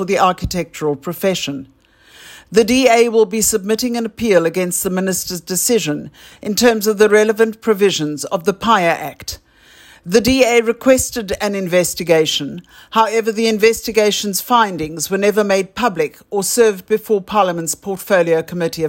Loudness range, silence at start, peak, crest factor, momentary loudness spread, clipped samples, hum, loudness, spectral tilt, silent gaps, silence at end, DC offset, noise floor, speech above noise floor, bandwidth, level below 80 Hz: 2 LU; 0 s; 0 dBFS; 16 dB; 10 LU; under 0.1%; none; -16 LUFS; -3.5 dB/octave; none; 0 s; under 0.1%; -46 dBFS; 31 dB; 16.5 kHz; -44 dBFS